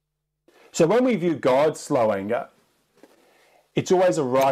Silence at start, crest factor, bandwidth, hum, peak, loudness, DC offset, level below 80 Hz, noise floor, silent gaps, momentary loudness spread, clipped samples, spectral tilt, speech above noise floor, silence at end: 0.75 s; 16 dB; 15 kHz; none; -8 dBFS; -22 LUFS; under 0.1%; -66 dBFS; -66 dBFS; none; 10 LU; under 0.1%; -5.5 dB/octave; 45 dB; 0 s